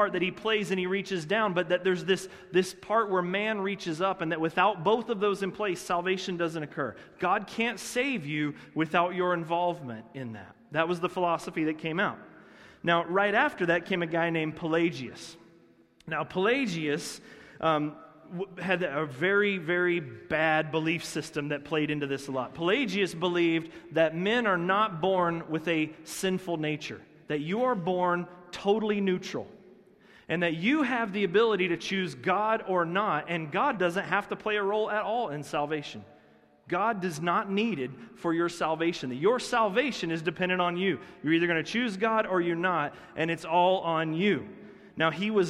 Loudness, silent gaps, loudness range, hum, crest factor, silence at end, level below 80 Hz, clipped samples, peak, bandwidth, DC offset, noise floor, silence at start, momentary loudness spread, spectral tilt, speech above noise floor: -29 LUFS; none; 3 LU; none; 20 dB; 0 s; -66 dBFS; under 0.1%; -10 dBFS; 14.5 kHz; under 0.1%; -60 dBFS; 0 s; 9 LU; -5 dB/octave; 31 dB